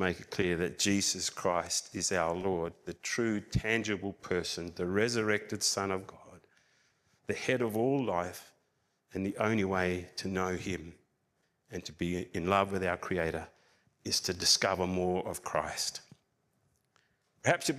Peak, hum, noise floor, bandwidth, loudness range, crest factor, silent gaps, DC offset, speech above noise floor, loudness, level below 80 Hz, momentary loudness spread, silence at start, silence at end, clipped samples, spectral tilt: -10 dBFS; none; -77 dBFS; 15.5 kHz; 4 LU; 24 dB; none; under 0.1%; 45 dB; -32 LUFS; -58 dBFS; 11 LU; 0 s; 0 s; under 0.1%; -3.5 dB/octave